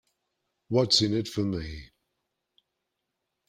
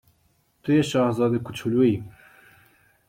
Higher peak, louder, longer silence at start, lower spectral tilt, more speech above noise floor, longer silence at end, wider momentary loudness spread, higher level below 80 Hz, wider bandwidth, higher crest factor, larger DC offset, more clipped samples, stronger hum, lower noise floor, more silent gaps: about the same, -10 dBFS vs -8 dBFS; second, -26 LUFS vs -23 LUFS; about the same, 0.7 s vs 0.65 s; second, -4.5 dB/octave vs -7 dB/octave; first, 56 dB vs 44 dB; first, 1.65 s vs 1 s; first, 17 LU vs 11 LU; first, -54 dBFS vs -60 dBFS; about the same, 15.5 kHz vs 16 kHz; first, 22 dB vs 16 dB; neither; neither; neither; first, -83 dBFS vs -66 dBFS; neither